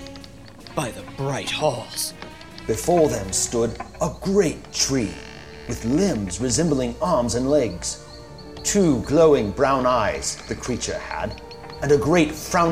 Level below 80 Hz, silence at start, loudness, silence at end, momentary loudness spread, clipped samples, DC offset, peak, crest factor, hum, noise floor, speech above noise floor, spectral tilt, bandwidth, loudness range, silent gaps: -42 dBFS; 0 s; -22 LUFS; 0 s; 19 LU; under 0.1%; 0.3%; -4 dBFS; 18 dB; none; -42 dBFS; 20 dB; -4.5 dB/octave; 16 kHz; 3 LU; none